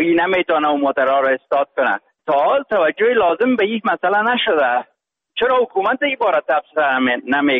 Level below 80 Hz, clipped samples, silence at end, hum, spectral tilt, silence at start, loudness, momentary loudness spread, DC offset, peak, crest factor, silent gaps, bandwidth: -60 dBFS; under 0.1%; 0 s; none; -7 dB/octave; 0 s; -17 LUFS; 4 LU; under 0.1%; -6 dBFS; 10 dB; none; 5.2 kHz